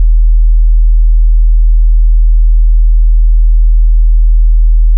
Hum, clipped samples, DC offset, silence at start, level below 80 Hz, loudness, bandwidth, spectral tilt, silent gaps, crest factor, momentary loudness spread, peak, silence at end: none; under 0.1%; under 0.1%; 0 s; -4 dBFS; -11 LUFS; 0.2 kHz; -25 dB/octave; none; 4 dB; 0 LU; -2 dBFS; 0 s